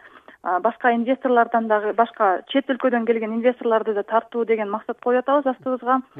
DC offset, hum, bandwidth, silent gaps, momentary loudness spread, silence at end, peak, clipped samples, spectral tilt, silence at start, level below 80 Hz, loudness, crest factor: under 0.1%; none; 4.6 kHz; none; 5 LU; 0 s; -4 dBFS; under 0.1%; -7.5 dB/octave; 0.05 s; -74 dBFS; -21 LUFS; 18 dB